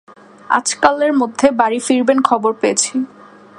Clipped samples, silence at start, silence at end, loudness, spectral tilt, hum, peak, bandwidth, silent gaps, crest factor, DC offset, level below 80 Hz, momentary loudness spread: under 0.1%; 0.5 s; 0.5 s; -15 LUFS; -2.5 dB/octave; none; 0 dBFS; 11.5 kHz; none; 16 dB; under 0.1%; -60 dBFS; 5 LU